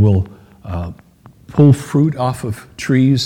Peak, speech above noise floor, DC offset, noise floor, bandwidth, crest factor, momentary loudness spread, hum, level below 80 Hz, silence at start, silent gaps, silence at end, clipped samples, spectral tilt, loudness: 0 dBFS; 27 dB; under 0.1%; -41 dBFS; 15 kHz; 16 dB; 16 LU; none; -42 dBFS; 0 s; none; 0 s; under 0.1%; -7.5 dB/octave; -16 LUFS